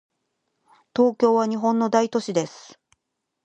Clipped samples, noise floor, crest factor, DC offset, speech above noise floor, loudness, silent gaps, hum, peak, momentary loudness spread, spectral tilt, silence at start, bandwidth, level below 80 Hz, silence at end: under 0.1%; -79 dBFS; 20 dB; under 0.1%; 58 dB; -22 LUFS; none; none; -4 dBFS; 8 LU; -5.5 dB/octave; 0.95 s; 8.6 kHz; -72 dBFS; 0.85 s